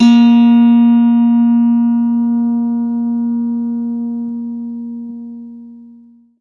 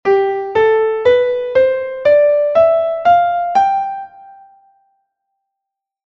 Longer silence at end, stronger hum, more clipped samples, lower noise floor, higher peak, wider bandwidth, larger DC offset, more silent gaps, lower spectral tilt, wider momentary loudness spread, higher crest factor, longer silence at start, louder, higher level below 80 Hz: second, 0.55 s vs 1.75 s; first, 60 Hz at -55 dBFS vs none; neither; second, -43 dBFS vs -81 dBFS; about the same, 0 dBFS vs -2 dBFS; about the same, 6.6 kHz vs 7 kHz; neither; neither; first, -7 dB/octave vs -5.5 dB/octave; first, 18 LU vs 5 LU; about the same, 12 dB vs 12 dB; about the same, 0 s vs 0.05 s; about the same, -13 LUFS vs -14 LUFS; about the same, -58 dBFS vs -54 dBFS